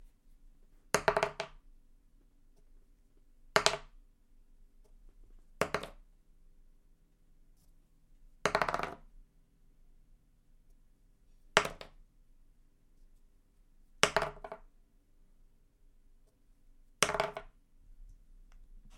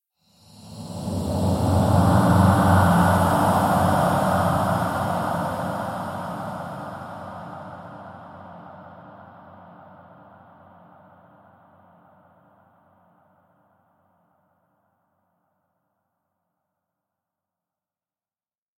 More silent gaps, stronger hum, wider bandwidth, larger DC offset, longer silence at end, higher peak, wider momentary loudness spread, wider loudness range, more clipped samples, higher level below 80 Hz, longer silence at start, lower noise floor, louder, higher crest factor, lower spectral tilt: neither; neither; about the same, 16 kHz vs 16.5 kHz; neither; second, 0.1 s vs 9.1 s; first, -2 dBFS vs -6 dBFS; second, 20 LU vs 25 LU; second, 8 LU vs 23 LU; neither; second, -58 dBFS vs -46 dBFS; second, 0 s vs 0.6 s; second, -65 dBFS vs under -90 dBFS; second, -33 LUFS vs -21 LUFS; first, 38 dB vs 20 dB; second, -2 dB/octave vs -7 dB/octave